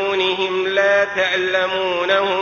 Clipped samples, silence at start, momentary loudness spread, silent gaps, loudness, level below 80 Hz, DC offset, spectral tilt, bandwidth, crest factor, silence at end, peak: under 0.1%; 0 s; 4 LU; none; -17 LUFS; -58 dBFS; under 0.1%; -3.5 dB/octave; 7 kHz; 16 dB; 0 s; -2 dBFS